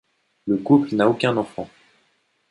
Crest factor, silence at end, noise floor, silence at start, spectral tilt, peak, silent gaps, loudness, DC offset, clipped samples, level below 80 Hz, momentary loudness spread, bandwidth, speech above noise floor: 20 dB; 0.85 s; -66 dBFS; 0.45 s; -7.5 dB/octave; -4 dBFS; none; -20 LUFS; under 0.1%; under 0.1%; -62 dBFS; 18 LU; 10.5 kHz; 47 dB